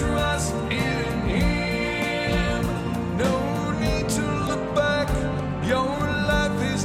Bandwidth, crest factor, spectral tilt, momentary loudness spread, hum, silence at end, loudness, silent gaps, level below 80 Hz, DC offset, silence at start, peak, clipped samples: 16 kHz; 12 dB; -5.5 dB/octave; 3 LU; none; 0 s; -24 LUFS; none; -34 dBFS; under 0.1%; 0 s; -10 dBFS; under 0.1%